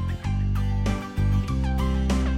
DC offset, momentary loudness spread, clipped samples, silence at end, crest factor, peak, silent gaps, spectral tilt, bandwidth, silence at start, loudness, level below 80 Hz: under 0.1%; 3 LU; under 0.1%; 0 s; 12 dB; -12 dBFS; none; -7 dB/octave; 12.5 kHz; 0 s; -26 LUFS; -26 dBFS